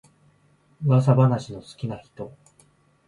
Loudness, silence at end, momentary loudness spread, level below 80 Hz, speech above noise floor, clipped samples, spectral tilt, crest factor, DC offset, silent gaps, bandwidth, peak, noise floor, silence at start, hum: -22 LUFS; 0.8 s; 21 LU; -60 dBFS; 39 dB; under 0.1%; -9 dB/octave; 20 dB; under 0.1%; none; 10.5 kHz; -6 dBFS; -61 dBFS; 0.8 s; none